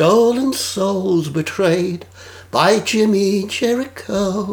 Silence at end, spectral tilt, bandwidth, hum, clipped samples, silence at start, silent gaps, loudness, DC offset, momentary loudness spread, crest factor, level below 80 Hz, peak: 0 s; -5 dB/octave; over 20 kHz; none; under 0.1%; 0 s; none; -17 LUFS; under 0.1%; 8 LU; 16 dB; -54 dBFS; 0 dBFS